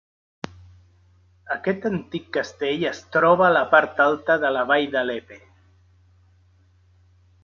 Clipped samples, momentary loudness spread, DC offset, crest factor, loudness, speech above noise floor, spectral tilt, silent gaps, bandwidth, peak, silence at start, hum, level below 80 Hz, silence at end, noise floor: under 0.1%; 16 LU; under 0.1%; 22 dB; -21 LUFS; 37 dB; -5.5 dB/octave; none; 7.2 kHz; -2 dBFS; 1.5 s; none; -58 dBFS; 2.05 s; -57 dBFS